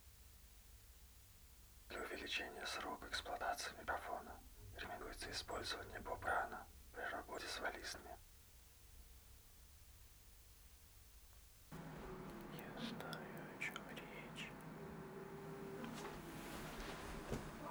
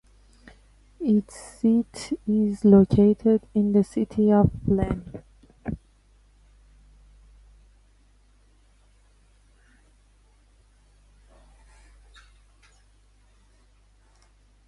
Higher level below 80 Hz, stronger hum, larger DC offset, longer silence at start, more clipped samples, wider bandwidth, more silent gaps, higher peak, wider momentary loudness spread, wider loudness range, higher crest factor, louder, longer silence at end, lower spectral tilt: second, -64 dBFS vs -46 dBFS; second, none vs 50 Hz at -50 dBFS; neither; second, 0 s vs 1 s; neither; first, over 20 kHz vs 11.5 kHz; neither; second, -30 dBFS vs -6 dBFS; about the same, 18 LU vs 19 LU; second, 12 LU vs 23 LU; about the same, 22 dB vs 20 dB; second, -49 LUFS vs -22 LUFS; second, 0 s vs 8.9 s; second, -3.5 dB/octave vs -8.5 dB/octave